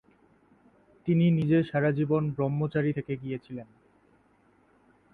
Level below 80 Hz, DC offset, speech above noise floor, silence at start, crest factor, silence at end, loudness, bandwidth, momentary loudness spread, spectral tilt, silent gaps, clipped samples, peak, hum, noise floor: -62 dBFS; under 0.1%; 38 dB; 1.05 s; 16 dB; 1.5 s; -27 LUFS; 4.3 kHz; 14 LU; -10.5 dB/octave; none; under 0.1%; -14 dBFS; none; -64 dBFS